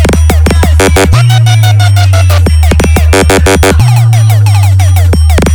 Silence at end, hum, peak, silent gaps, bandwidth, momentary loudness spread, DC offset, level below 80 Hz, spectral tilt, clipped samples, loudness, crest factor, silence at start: 0 s; none; 0 dBFS; none; 19 kHz; 1 LU; under 0.1%; -10 dBFS; -5.5 dB/octave; 0.3%; -6 LUFS; 4 dB; 0 s